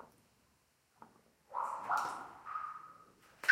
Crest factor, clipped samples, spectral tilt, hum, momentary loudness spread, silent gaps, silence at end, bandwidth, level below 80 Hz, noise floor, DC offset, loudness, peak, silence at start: 28 dB; under 0.1%; -1.5 dB/octave; none; 25 LU; none; 0 s; 16 kHz; -82 dBFS; -74 dBFS; under 0.1%; -41 LUFS; -12 dBFS; 0 s